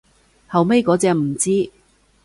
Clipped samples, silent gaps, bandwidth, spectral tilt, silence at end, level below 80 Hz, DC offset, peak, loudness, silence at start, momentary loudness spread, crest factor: under 0.1%; none; 11.5 kHz; -5.5 dB/octave; 0.55 s; -56 dBFS; under 0.1%; -4 dBFS; -18 LUFS; 0.5 s; 6 LU; 16 dB